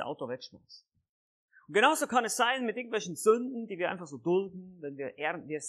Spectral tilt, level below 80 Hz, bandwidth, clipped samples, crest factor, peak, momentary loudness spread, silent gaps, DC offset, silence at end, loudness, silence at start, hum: -3 dB/octave; -82 dBFS; 14.5 kHz; under 0.1%; 22 dB; -10 dBFS; 16 LU; 1.09-1.48 s; under 0.1%; 0 s; -30 LUFS; 0 s; none